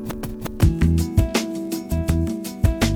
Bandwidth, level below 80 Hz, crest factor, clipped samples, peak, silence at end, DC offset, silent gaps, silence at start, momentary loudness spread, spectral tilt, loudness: 19 kHz; -26 dBFS; 18 dB; under 0.1%; -4 dBFS; 0 s; under 0.1%; none; 0 s; 10 LU; -6 dB/octave; -22 LUFS